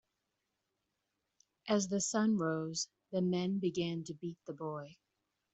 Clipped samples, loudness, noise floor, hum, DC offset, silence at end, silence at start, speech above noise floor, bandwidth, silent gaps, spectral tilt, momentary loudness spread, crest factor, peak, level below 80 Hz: under 0.1%; -36 LUFS; -86 dBFS; none; under 0.1%; 0.6 s; 1.65 s; 50 dB; 8.2 kHz; none; -5 dB/octave; 12 LU; 20 dB; -18 dBFS; -78 dBFS